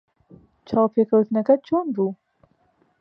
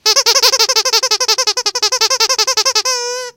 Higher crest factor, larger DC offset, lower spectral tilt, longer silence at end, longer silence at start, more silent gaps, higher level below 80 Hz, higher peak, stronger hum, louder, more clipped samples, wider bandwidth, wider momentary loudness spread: about the same, 18 dB vs 14 dB; neither; first, -10 dB/octave vs 3.5 dB/octave; first, 0.85 s vs 0.05 s; first, 0.7 s vs 0.05 s; neither; about the same, -62 dBFS vs -62 dBFS; second, -4 dBFS vs 0 dBFS; neither; second, -21 LUFS vs -11 LUFS; second, under 0.1% vs 0.2%; second, 5.6 kHz vs over 20 kHz; about the same, 7 LU vs 5 LU